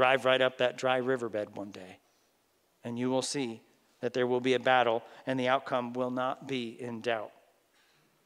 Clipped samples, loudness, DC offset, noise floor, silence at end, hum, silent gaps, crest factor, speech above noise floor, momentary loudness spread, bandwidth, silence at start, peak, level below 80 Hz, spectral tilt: under 0.1%; -31 LUFS; under 0.1%; -72 dBFS; 0.95 s; none; none; 22 dB; 41 dB; 16 LU; 14 kHz; 0 s; -10 dBFS; -86 dBFS; -4.5 dB/octave